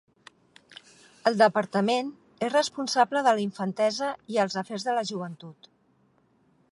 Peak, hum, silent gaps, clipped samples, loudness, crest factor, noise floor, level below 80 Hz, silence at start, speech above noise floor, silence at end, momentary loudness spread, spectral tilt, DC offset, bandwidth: -6 dBFS; none; none; under 0.1%; -26 LUFS; 20 dB; -66 dBFS; -78 dBFS; 1.25 s; 40 dB; 1.2 s; 13 LU; -4.5 dB/octave; under 0.1%; 11.5 kHz